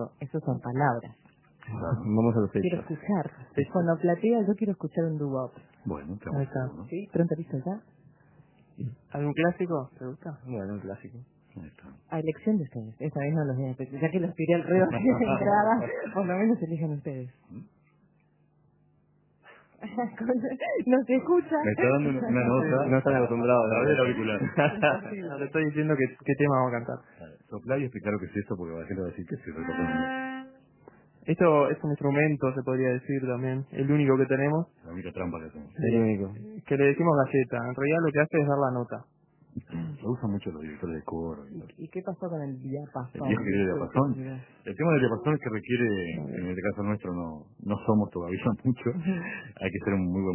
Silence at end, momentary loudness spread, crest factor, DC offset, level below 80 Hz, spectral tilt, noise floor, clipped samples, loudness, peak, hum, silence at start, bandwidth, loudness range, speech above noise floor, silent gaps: 0 s; 15 LU; 22 dB; under 0.1%; -58 dBFS; -11.5 dB/octave; -66 dBFS; under 0.1%; -28 LUFS; -8 dBFS; none; 0 s; 3.2 kHz; 9 LU; 38 dB; none